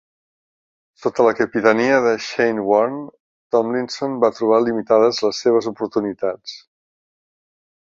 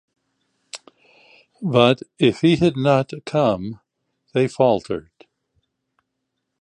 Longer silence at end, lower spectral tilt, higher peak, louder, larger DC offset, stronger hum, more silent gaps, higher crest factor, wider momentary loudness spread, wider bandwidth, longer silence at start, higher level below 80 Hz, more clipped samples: second, 1.25 s vs 1.6 s; second, -5 dB/octave vs -6.5 dB/octave; about the same, -2 dBFS vs -2 dBFS; about the same, -18 LUFS vs -19 LUFS; neither; neither; first, 3.20-3.50 s vs none; about the same, 18 dB vs 20 dB; second, 10 LU vs 19 LU; second, 7.6 kHz vs 10.5 kHz; first, 1 s vs 0.75 s; second, -64 dBFS vs -56 dBFS; neither